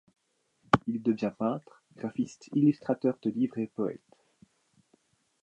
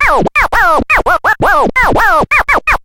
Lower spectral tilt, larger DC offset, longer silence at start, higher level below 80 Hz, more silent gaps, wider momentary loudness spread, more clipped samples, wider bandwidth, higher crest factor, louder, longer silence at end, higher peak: first, -7.5 dB/octave vs -4.5 dB/octave; neither; first, 0.75 s vs 0 s; second, -64 dBFS vs -24 dBFS; neither; first, 10 LU vs 2 LU; neither; second, 9.2 kHz vs 16.5 kHz; first, 28 dB vs 10 dB; second, -30 LUFS vs -9 LUFS; first, 1.45 s vs 0.05 s; second, -4 dBFS vs 0 dBFS